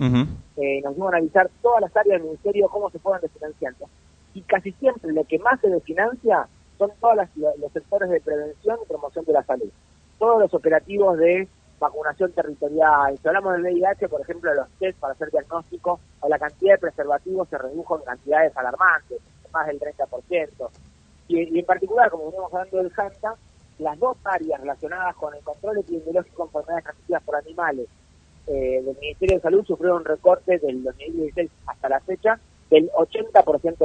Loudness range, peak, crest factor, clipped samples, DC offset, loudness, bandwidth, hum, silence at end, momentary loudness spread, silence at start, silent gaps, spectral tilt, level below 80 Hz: 6 LU; -2 dBFS; 20 dB; under 0.1%; under 0.1%; -22 LUFS; 9 kHz; none; 0 s; 12 LU; 0 s; none; -7 dB/octave; -50 dBFS